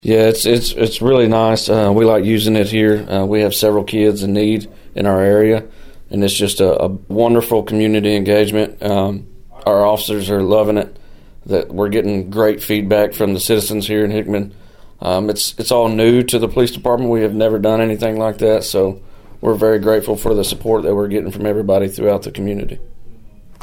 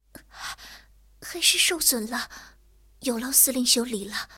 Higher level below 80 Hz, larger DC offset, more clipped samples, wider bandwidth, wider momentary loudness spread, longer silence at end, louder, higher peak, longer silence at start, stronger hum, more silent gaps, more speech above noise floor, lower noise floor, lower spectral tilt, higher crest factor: first, -36 dBFS vs -56 dBFS; neither; neither; about the same, 17.5 kHz vs 16.5 kHz; second, 8 LU vs 19 LU; about the same, 0.1 s vs 0 s; first, -15 LUFS vs -21 LUFS; first, 0 dBFS vs -4 dBFS; second, 0.05 s vs 0.35 s; neither; neither; second, 22 dB vs 31 dB; second, -36 dBFS vs -56 dBFS; first, -5.5 dB/octave vs 0 dB/octave; second, 14 dB vs 22 dB